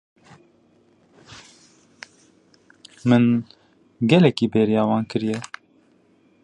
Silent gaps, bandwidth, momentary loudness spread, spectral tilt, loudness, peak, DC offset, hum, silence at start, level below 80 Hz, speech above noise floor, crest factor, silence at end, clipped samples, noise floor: none; 9.8 kHz; 27 LU; -7.5 dB/octave; -20 LUFS; -2 dBFS; under 0.1%; none; 1.3 s; -62 dBFS; 40 dB; 22 dB; 1 s; under 0.1%; -58 dBFS